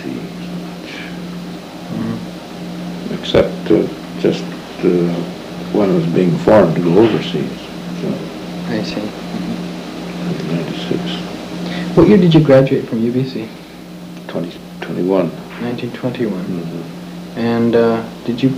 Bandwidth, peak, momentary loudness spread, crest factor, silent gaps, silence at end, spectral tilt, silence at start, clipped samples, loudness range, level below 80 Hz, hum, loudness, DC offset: 15.5 kHz; 0 dBFS; 17 LU; 16 dB; none; 0 s; -7.5 dB/octave; 0 s; under 0.1%; 8 LU; -44 dBFS; none; -17 LUFS; under 0.1%